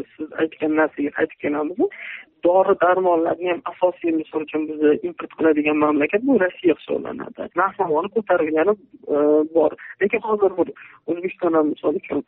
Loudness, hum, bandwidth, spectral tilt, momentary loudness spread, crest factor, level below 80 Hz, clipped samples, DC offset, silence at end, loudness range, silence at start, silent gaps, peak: -21 LUFS; none; 3.9 kHz; -4.5 dB/octave; 9 LU; 14 dB; -64 dBFS; under 0.1%; under 0.1%; 0.05 s; 1 LU; 0 s; none; -6 dBFS